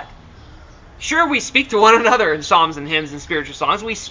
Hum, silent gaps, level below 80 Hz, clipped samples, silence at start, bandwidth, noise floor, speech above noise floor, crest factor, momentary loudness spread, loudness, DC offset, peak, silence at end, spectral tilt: none; none; -44 dBFS; under 0.1%; 0 s; 7.6 kHz; -41 dBFS; 24 dB; 18 dB; 11 LU; -16 LUFS; under 0.1%; 0 dBFS; 0 s; -3 dB/octave